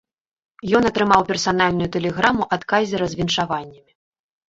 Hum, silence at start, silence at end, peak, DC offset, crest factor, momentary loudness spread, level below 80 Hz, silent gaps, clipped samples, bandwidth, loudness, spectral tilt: none; 0.65 s; 0.75 s; -2 dBFS; under 0.1%; 20 dB; 6 LU; -48 dBFS; none; under 0.1%; 8 kHz; -19 LUFS; -4.5 dB/octave